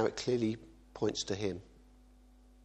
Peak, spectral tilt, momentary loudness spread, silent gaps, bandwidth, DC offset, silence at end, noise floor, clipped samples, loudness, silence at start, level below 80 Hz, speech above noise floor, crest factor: -16 dBFS; -5 dB/octave; 14 LU; none; 9.2 kHz; under 0.1%; 0.95 s; -60 dBFS; under 0.1%; -36 LUFS; 0 s; -60 dBFS; 25 dB; 20 dB